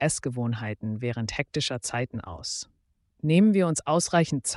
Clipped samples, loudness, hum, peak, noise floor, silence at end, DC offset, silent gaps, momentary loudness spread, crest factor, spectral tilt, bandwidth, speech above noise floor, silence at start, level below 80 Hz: under 0.1%; -26 LUFS; none; -10 dBFS; -69 dBFS; 0 s; under 0.1%; none; 12 LU; 18 dB; -5 dB/octave; 11.5 kHz; 43 dB; 0 s; -56 dBFS